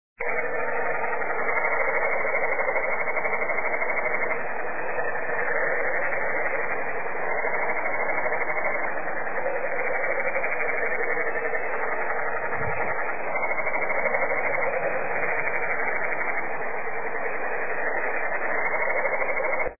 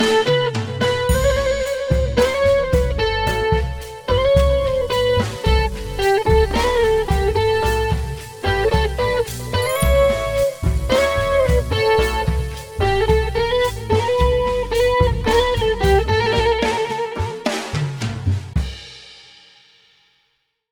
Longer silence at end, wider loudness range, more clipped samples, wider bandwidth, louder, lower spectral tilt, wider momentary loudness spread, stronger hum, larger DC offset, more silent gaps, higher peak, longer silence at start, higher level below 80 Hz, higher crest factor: second, 0 s vs 1.55 s; about the same, 2 LU vs 3 LU; neither; second, 2.8 kHz vs over 20 kHz; second, -26 LUFS vs -18 LUFS; first, -10.5 dB/octave vs -5 dB/octave; second, 4 LU vs 7 LU; neither; first, 4% vs under 0.1%; neither; second, -10 dBFS vs -2 dBFS; first, 0.15 s vs 0 s; second, -60 dBFS vs -26 dBFS; about the same, 16 dB vs 16 dB